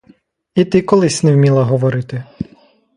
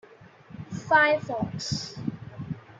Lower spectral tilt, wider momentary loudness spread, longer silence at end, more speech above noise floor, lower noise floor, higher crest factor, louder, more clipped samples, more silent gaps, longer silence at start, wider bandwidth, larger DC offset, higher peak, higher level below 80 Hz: first, -6.5 dB/octave vs -4.5 dB/octave; second, 17 LU vs 20 LU; first, 0.55 s vs 0 s; first, 38 dB vs 26 dB; about the same, -51 dBFS vs -51 dBFS; second, 14 dB vs 22 dB; first, -14 LUFS vs -25 LUFS; neither; neither; first, 0.55 s vs 0.1 s; first, 11.5 kHz vs 9.2 kHz; neither; first, 0 dBFS vs -8 dBFS; first, -50 dBFS vs -60 dBFS